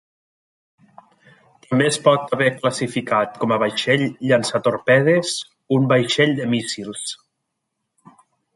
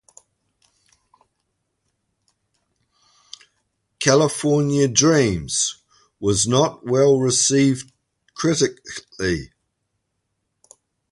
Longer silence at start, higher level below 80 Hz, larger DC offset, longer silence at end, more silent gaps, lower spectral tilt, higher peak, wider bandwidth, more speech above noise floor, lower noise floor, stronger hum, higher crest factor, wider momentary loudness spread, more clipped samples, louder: second, 1.7 s vs 4 s; second, -64 dBFS vs -50 dBFS; neither; second, 1.4 s vs 1.65 s; neither; about the same, -4.5 dB/octave vs -4 dB/octave; about the same, -2 dBFS vs -2 dBFS; about the same, 11.5 kHz vs 11.5 kHz; about the same, 58 dB vs 57 dB; about the same, -77 dBFS vs -75 dBFS; neither; about the same, 18 dB vs 20 dB; about the same, 11 LU vs 11 LU; neither; about the same, -19 LUFS vs -19 LUFS